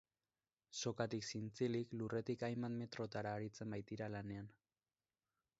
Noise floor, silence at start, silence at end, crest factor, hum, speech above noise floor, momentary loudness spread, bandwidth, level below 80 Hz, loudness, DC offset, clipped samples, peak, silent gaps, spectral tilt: under -90 dBFS; 0.7 s; 1.1 s; 22 dB; none; over 45 dB; 7 LU; 7.6 kHz; -76 dBFS; -45 LUFS; under 0.1%; under 0.1%; -26 dBFS; none; -5.5 dB/octave